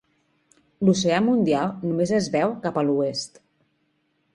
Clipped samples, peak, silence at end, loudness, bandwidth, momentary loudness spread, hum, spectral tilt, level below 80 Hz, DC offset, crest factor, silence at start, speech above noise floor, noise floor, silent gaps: under 0.1%; -6 dBFS; 1.1 s; -23 LUFS; 11 kHz; 6 LU; none; -5.5 dB/octave; -60 dBFS; under 0.1%; 18 dB; 0.8 s; 48 dB; -70 dBFS; none